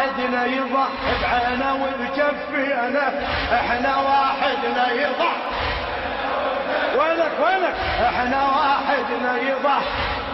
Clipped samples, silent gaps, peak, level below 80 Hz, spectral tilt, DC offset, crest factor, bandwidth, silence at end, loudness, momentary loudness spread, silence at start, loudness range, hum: under 0.1%; none; -6 dBFS; -42 dBFS; -6 dB/octave; under 0.1%; 14 dB; 6 kHz; 0 s; -21 LUFS; 5 LU; 0 s; 1 LU; none